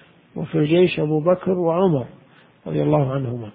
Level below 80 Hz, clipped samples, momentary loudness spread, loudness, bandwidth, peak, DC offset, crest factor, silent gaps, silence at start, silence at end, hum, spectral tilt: -54 dBFS; under 0.1%; 16 LU; -20 LUFS; 4.9 kHz; -4 dBFS; under 0.1%; 16 dB; none; 0.35 s; 0.05 s; none; -12.5 dB/octave